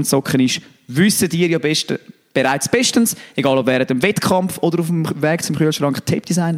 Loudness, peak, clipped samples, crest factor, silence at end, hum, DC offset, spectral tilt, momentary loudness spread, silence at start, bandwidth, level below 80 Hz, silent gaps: -17 LUFS; -2 dBFS; under 0.1%; 16 dB; 0 s; none; under 0.1%; -4.5 dB/octave; 5 LU; 0 s; 16.5 kHz; -56 dBFS; none